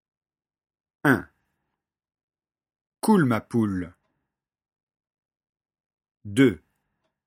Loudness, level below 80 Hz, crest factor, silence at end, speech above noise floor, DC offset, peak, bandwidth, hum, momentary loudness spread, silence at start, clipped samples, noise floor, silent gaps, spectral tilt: -23 LUFS; -62 dBFS; 24 dB; 0.7 s; 62 dB; under 0.1%; -4 dBFS; 16 kHz; none; 11 LU; 1.05 s; under 0.1%; -83 dBFS; 2.23-2.28 s, 2.81-2.92 s, 4.83-4.87 s, 5.18-5.29 s, 5.49-5.53 s, 5.86-5.90 s, 6.11-6.15 s; -6.5 dB/octave